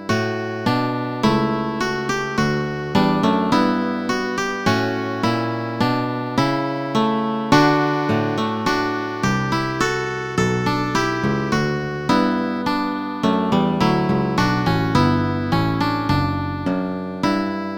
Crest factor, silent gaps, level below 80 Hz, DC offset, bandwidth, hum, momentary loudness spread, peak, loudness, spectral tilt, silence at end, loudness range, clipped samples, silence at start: 20 dB; none; -44 dBFS; under 0.1%; 19.5 kHz; none; 5 LU; 0 dBFS; -20 LUFS; -6 dB/octave; 0 s; 2 LU; under 0.1%; 0 s